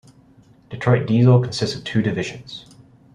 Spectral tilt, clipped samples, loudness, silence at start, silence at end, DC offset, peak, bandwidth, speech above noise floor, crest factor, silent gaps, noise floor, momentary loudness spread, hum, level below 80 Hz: -7 dB/octave; under 0.1%; -19 LUFS; 0.7 s; 0.55 s; under 0.1%; -2 dBFS; 10.5 kHz; 33 dB; 18 dB; none; -51 dBFS; 22 LU; none; -54 dBFS